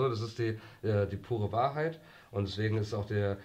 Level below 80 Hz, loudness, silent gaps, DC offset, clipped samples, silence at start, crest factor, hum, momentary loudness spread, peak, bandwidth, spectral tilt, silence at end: -62 dBFS; -34 LUFS; none; under 0.1%; under 0.1%; 0 s; 16 dB; none; 6 LU; -18 dBFS; 8.6 kHz; -7.5 dB/octave; 0 s